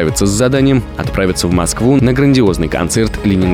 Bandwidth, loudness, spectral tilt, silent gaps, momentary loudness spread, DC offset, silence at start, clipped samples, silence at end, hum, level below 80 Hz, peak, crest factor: 16.5 kHz; -13 LUFS; -5.5 dB/octave; none; 5 LU; under 0.1%; 0 s; under 0.1%; 0 s; none; -26 dBFS; -2 dBFS; 10 dB